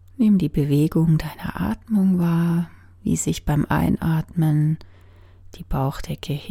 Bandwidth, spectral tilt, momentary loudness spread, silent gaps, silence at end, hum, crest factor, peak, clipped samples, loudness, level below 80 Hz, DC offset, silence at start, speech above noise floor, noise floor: 15.5 kHz; -7 dB/octave; 11 LU; none; 0 s; none; 16 dB; -6 dBFS; under 0.1%; -22 LUFS; -38 dBFS; under 0.1%; 0.2 s; 27 dB; -47 dBFS